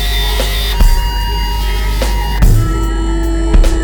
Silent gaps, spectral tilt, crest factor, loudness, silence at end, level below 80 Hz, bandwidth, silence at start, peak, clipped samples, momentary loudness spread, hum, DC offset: none; -5 dB/octave; 10 dB; -15 LUFS; 0 s; -12 dBFS; over 20 kHz; 0 s; 0 dBFS; under 0.1%; 4 LU; none; under 0.1%